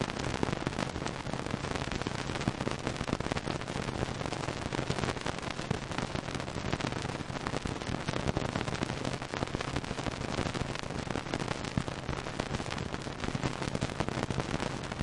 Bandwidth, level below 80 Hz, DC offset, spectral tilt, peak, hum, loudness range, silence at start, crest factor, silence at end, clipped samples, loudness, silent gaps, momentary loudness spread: 11.5 kHz; -48 dBFS; under 0.1%; -5 dB/octave; -12 dBFS; none; 1 LU; 0 s; 24 dB; 0 s; under 0.1%; -35 LUFS; none; 3 LU